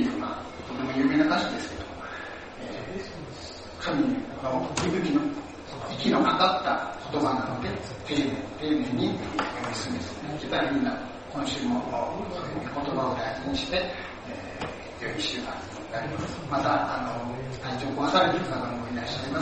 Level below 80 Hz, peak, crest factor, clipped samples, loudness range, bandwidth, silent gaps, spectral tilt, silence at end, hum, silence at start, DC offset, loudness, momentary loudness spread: -52 dBFS; -8 dBFS; 22 dB; under 0.1%; 5 LU; 8.4 kHz; none; -5 dB/octave; 0 s; none; 0 s; under 0.1%; -29 LUFS; 14 LU